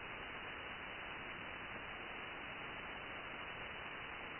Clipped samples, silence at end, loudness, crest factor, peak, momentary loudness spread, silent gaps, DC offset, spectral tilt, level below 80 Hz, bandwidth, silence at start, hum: under 0.1%; 0 s; -47 LUFS; 12 dB; -36 dBFS; 0 LU; none; under 0.1%; -1 dB/octave; -66 dBFS; 4 kHz; 0 s; none